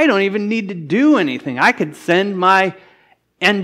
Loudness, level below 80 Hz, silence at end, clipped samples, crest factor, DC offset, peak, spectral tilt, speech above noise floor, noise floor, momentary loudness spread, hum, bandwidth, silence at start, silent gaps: -16 LUFS; -68 dBFS; 0 s; under 0.1%; 16 dB; under 0.1%; 0 dBFS; -5.5 dB/octave; 39 dB; -54 dBFS; 8 LU; none; 14 kHz; 0 s; none